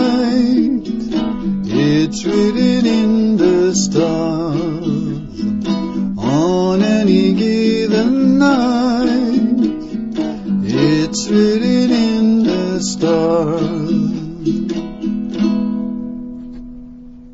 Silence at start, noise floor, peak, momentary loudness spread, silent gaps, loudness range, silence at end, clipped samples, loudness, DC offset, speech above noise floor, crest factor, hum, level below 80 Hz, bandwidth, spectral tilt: 0 s; -35 dBFS; 0 dBFS; 9 LU; none; 4 LU; 0 s; under 0.1%; -15 LUFS; under 0.1%; 20 dB; 14 dB; none; -40 dBFS; 8 kHz; -6 dB/octave